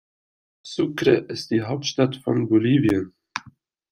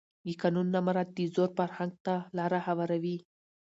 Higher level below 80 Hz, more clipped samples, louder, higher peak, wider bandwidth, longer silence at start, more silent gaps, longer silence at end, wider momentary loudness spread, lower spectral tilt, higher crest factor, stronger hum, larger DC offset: first, -58 dBFS vs -76 dBFS; neither; first, -22 LUFS vs -32 LUFS; first, -4 dBFS vs -14 dBFS; first, 12.5 kHz vs 7.8 kHz; first, 0.65 s vs 0.25 s; second, none vs 2.00-2.05 s; about the same, 0.4 s vs 0.4 s; first, 14 LU vs 7 LU; second, -6 dB/octave vs -8 dB/octave; about the same, 18 dB vs 18 dB; neither; neither